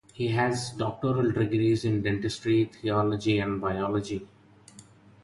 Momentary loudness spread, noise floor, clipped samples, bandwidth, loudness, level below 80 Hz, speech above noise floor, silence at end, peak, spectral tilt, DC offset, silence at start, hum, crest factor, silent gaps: 5 LU; -53 dBFS; under 0.1%; 11.5 kHz; -27 LUFS; -54 dBFS; 26 dB; 0.4 s; -12 dBFS; -6.5 dB/octave; under 0.1%; 0.15 s; none; 16 dB; none